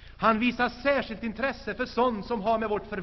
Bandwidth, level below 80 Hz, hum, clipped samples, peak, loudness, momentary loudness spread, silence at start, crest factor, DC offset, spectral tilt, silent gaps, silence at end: 6.2 kHz; -50 dBFS; none; under 0.1%; -8 dBFS; -27 LUFS; 7 LU; 0 s; 20 dB; under 0.1%; -3 dB/octave; none; 0 s